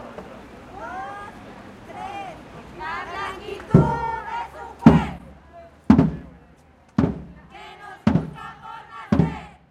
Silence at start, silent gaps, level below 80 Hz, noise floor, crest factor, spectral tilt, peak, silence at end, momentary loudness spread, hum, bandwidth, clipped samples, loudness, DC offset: 0 s; none; -40 dBFS; -52 dBFS; 24 dB; -8.5 dB/octave; 0 dBFS; 0.2 s; 23 LU; none; 9.6 kHz; under 0.1%; -22 LUFS; under 0.1%